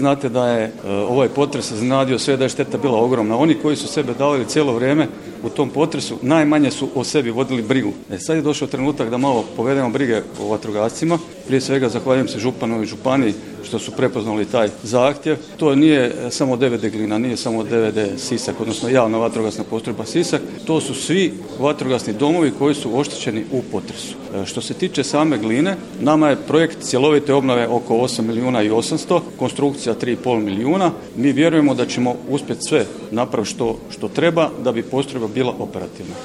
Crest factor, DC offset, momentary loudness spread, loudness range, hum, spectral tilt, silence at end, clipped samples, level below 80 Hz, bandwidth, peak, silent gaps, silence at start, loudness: 18 dB; under 0.1%; 8 LU; 3 LU; none; -5.5 dB/octave; 0 s; under 0.1%; -54 dBFS; 12.5 kHz; 0 dBFS; none; 0 s; -19 LUFS